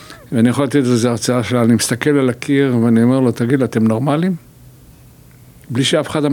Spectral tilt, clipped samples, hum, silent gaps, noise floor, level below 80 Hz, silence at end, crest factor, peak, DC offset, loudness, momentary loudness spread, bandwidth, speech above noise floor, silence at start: -5.5 dB/octave; under 0.1%; none; none; -43 dBFS; -52 dBFS; 0 s; 14 dB; -2 dBFS; under 0.1%; -15 LUFS; 5 LU; 18 kHz; 29 dB; 0 s